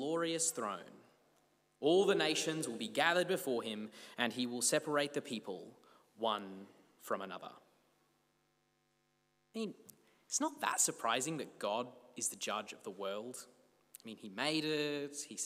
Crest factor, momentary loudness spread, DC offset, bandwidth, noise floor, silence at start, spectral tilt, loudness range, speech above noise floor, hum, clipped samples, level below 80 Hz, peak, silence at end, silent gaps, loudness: 24 dB; 16 LU; under 0.1%; 16 kHz; -78 dBFS; 0 s; -2.5 dB/octave; 10 LU; 41 dB; 50 Hz at -80 dBFS; under 0.1%; under -90 dBFS; -16 dBFS; 0 s; none; -36 LUFS